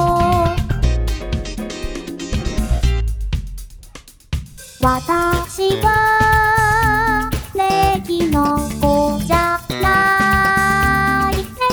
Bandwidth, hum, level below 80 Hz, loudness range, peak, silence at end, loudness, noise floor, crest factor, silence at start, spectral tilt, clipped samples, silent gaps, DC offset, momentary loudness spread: over 20 kHz; none; -24 dBFS; 8 LU; -2 dBFS; 0 s; -16 LUFS; -40 dBFS; 16 dB; 0 s; -5 dB/octave; under 0.1%; none; under 0.1%; 13 LU